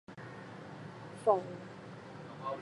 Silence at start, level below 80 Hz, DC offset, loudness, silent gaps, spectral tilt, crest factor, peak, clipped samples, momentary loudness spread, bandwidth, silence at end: 0.1 s; -76 dBFS; under 0.1%; -38 LUFS; none; -6.5 dB/octave; 24 dB; -14 dBFS; under 0.1%; 17 LU; 11 kHz; 0 s